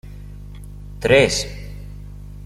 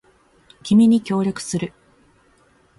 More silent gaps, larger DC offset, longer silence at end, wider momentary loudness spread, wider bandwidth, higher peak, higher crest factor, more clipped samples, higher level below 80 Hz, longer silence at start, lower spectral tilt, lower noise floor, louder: neither; neither; second, 0 s vs 1.1 s; first, 24 LU vs 16 LU; first, 15.5 kHz vs 11.5 kHz; first, -2 dBFS vs -6 dBFS; about the same, 20 dB vs 16 dB; neither; first, -36 dBFS vs -58 dBFS; second, 0.05 s vs 0.65 s; second, -4 dB/octave vs -6 dB/octave; second, -35 dBFS vs -57 dBFS; about the same, -17 LUFS vs -18 LUFS